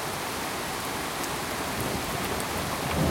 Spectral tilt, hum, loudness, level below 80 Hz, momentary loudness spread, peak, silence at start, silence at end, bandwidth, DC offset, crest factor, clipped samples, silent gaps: -3.5 dB/octave; none; -30 LUFS; -48 dBFS; 2 LU; -12 dBFS; 0 s; 0 s; 17 kHz; under 0.1%; 18 dB; under 0.1%; none